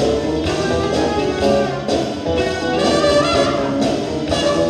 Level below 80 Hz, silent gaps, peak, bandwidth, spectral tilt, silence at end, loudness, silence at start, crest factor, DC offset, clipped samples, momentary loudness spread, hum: -36 dBFS; none; -2 dBFS; 12 kHz; -5 dB/octave; 0 s; -17 LUFS; 0 s; 14 dB; under 0.1%; under 0.1%; 6 LU; none